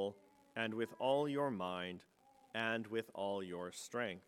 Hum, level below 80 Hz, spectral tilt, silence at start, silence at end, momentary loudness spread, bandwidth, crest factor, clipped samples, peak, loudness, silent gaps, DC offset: none; -86 dBFS; -5 dB/octave; 0 s; 0.1 s; 10 LU; 16 kHz; 20 dB; under 0.1%; -22 dBFS; -41 LUFS; none; under 0.1%